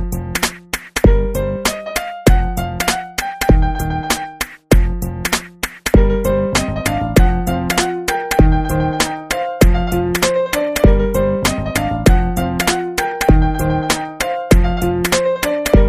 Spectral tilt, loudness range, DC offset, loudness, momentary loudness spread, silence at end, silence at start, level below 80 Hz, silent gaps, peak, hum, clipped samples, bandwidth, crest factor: -5 dB/octave; 2 LU; 0.2%; -16 LUFS; 7 LU; 0 s; 0 s; -18 dBFS; none; 0 dBFS; none; under 0.1%; 15.5 kHz; 14 dB